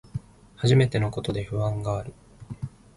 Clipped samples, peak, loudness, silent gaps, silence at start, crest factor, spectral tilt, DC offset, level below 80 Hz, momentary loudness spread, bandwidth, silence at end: under 0.1%; -8 dBFS; -25 LUFS; none; 0.15 s; 18 dB; -7 dB/octave; under 0.1%; -48 dBFS; 18 LU; 11.5 kHz; 0.3 s